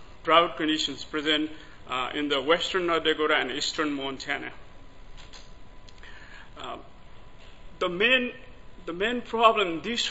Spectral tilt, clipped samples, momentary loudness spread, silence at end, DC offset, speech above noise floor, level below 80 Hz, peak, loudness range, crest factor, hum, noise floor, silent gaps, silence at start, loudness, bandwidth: -3 dB/octave; under 0.1%; 21 LU; 0 s; 0.4%; 21 dB; -50 dBFS; -4 dBFS; 14 LU; 24 dB; none; -47 dBFS; none; 0 s; -25 LUFS; 8 kHz